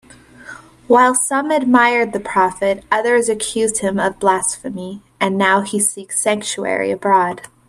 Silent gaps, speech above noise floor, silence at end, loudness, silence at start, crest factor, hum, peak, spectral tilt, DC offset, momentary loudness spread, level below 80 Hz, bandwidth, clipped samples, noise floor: none; 22 dB; 0.25 s; -16 LUFS; 0.4 s; 16 dB; none; 0 dBFS; -3 dB/octave; under 0.1%; 10 LU; -54 dBFS; 13.5 kHz; under 0.1%; -39 dBFS